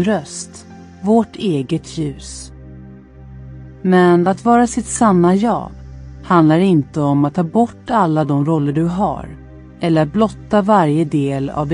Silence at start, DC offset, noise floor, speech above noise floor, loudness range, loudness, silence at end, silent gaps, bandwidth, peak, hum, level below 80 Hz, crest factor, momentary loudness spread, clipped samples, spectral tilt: 0 s; under 0.1%; -37 dBFS; 22 dB; 7 LU; -15 LUFS; 0 s; none; 11 kHz; 0 dBFS; none; -42 dBFS; 16 dB; 20 LU; under 0.1%; -6.5 dB/octave